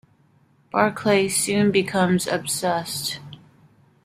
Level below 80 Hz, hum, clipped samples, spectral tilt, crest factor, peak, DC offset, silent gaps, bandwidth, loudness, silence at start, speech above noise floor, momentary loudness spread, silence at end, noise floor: -60 dBFS; none; under 0.1%; -4 dB/octave; 20 dB; -2 dBFS; under 0.1%; none; 16 kHz; -21 LUFS; 0.75 s; 38 dB; 8 LU; 0.7 s; -59 dBFS